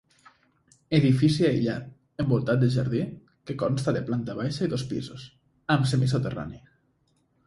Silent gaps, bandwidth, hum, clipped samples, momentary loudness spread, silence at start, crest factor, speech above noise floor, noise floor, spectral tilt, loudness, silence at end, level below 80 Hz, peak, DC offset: none; 11.5 kHz; none; under 0.1%; 16 LU; 0.9 s; 18 dB; 44 dB; -69 dBFS; -7 dB/octave; -26 LUFS; 0.9 s; -56 dBFS; -8 dBFS; under 0.1%